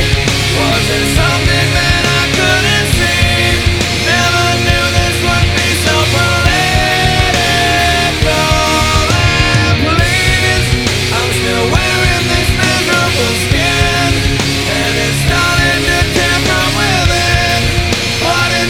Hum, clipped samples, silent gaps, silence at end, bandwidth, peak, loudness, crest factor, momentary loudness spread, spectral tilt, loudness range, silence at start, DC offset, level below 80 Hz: none; under 0.1%; none; 0 s; 17.5 kHz; 0 dBFS; -11 LUFS; 12 dB; 2 LU; -3.5 dB/octave; 1 LU; 0 s; under 0.1%; -22 dBFS